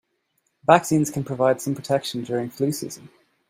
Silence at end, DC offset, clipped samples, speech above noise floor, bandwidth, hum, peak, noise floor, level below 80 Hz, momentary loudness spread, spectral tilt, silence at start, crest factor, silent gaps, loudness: 0.45 s; under 0.1%; under 0.1%; 50 dB; 16.5 kHz; none; 0 dBFS; -72 dBFS; -64 dBFS; 12 LU; -5.5 dB/octave; 0.7 s; 22 dB; none; -22 LUFS